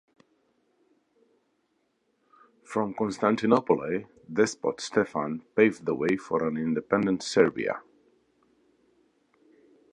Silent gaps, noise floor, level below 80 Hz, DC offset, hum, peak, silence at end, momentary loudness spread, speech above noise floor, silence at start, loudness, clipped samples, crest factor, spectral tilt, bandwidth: none; -73 dBFS; -68 dBFS; under 0.1%; none; -6 dBFS; 2.1 s; 9 LU; 47 dB; 2.7 s; -27 LUFS; under 0.1%; 22 dB; -5.5 dB/octave; 11 kHz